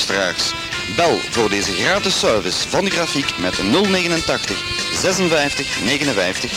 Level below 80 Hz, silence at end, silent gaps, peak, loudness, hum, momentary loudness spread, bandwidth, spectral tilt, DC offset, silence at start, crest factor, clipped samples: -42 dBFS; 0 s; none; 0 dBFS; -17 LUFS; none; 4 LU; 16.5 kHz; -3 dB/octave; under 0.1%; 0 s; 18 dB; under 0.1%